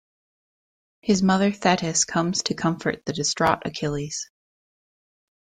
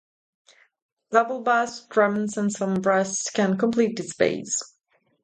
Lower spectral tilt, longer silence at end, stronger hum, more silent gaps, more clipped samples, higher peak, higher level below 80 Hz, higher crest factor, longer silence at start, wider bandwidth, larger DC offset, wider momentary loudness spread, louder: about the same, -4 dB/octave vs -4.5 dB/octave; first, 1.2 s vs 0.6 s; neither; neither; neither; about the same, -4 dBFS vs -4 dBFS; first, -56 dBFS vs -68 dBFS; about the same, 20 dB vs 20 dB; about the same, 1.05 s vs 1.1 s; about the same, 9.6 kHz vs 9.6 kHz; neither; first, 10 LU vs 5 LU; about the same, -23 LUFS vs -23 LUFS